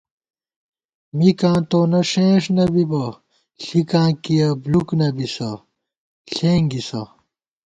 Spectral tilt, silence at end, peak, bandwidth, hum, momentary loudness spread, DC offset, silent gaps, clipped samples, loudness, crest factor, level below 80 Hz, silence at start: -7 dB/octave; 0.6 s; -2 dBFS; 9 kHz; none; 13 LU; under 0.1%; 5.98-6.25 s; under 0.1%; -18 LUFS; 16 dB; -52 dBFS; 1.15 s